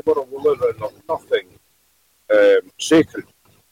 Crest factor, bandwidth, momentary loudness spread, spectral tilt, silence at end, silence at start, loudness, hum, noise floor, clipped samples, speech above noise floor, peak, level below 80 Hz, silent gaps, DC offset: 14 dB; 15.5 kHz; 13 LU; -4.5 dB/octave; 0.5 s; 0.05 s; -18 LUFS; none; -61 dBFS; under 0.1%; 42 dB; -6 dBFS; -60 dBFS; none; under 0.1%